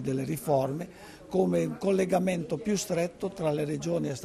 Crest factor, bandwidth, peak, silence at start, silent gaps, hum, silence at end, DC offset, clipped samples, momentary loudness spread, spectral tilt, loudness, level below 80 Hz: 16 dB; 13.5 kHz; -14 dBFS; 0 s; none; none; 0 s; under 0.1%; under 0.1%; 7 LU; -6 dB/octave; -29 LUFS; -60 dBFS